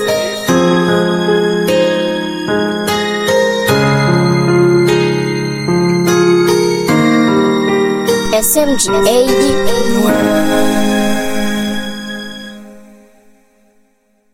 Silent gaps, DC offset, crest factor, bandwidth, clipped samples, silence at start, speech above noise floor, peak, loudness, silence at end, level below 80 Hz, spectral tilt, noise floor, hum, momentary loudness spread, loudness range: none; under 0.1%; 12 dB; 16.5 kHz; under 0.1%; 0 s; 45 dB; 0 dBFS; -12 LUFS; 1.5 s; -40 dBFS; -5 dB/octave; -56 dBFS; none; 7 LU; 5 LU